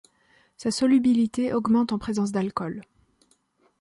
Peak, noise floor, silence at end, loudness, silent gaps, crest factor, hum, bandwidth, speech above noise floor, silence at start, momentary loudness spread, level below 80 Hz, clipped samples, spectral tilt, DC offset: -12 dBFS; -65 dBFS; 1 s; -24 LUFS; none; 14 dB; none; 11.5 kHz; 42 dB; 0.6 s; 12 LU; -58 dBFS; under 0.1%; -5.5 dB/octave; under 0.1%